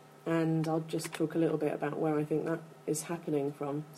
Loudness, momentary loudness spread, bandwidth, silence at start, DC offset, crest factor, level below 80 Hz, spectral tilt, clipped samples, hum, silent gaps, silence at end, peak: -33 LUFS; 6 LU; 15 kHz; 0.05 s; under 0.1%; 14 dB; -78 dBFS; -6 dB/octave; under 0.1%; none; none; 0 s; -18 dBFS